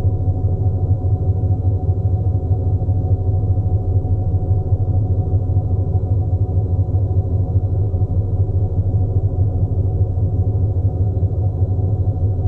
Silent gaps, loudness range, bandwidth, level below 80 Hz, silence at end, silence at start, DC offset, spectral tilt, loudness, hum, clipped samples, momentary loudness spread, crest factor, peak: none; 0 LU; 1.3 kHz; -26 dBFS; 0 s; 0 s; under 0.1%; -13.5 dB/octave; -19 LUFS; 50 Hz at -45 dBFS; under 0.1%; 1 LU; 10 dB; -6 dBFS